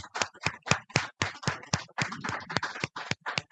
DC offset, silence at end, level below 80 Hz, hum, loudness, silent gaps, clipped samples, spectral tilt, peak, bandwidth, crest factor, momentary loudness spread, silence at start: under 0.1%; 0.1 s; -64 dBFS; none; -32 LUFS; none; under 0.1%; -3 dB/octave; -4 dBFS; 9.4 kHz; 30 dB; 6 LU; 0 s